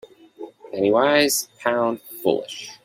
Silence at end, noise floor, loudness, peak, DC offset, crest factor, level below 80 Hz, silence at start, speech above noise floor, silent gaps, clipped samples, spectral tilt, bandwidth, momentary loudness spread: 0.1 s; -41 dBFS; -21 LUFS; -4 dBFS; under 0.1%; 18 dB; -66 dBFS; 0.4 s; 20 dB; none; under 0.1%; -3 dB/octave; 16.5 kHz; 21 LU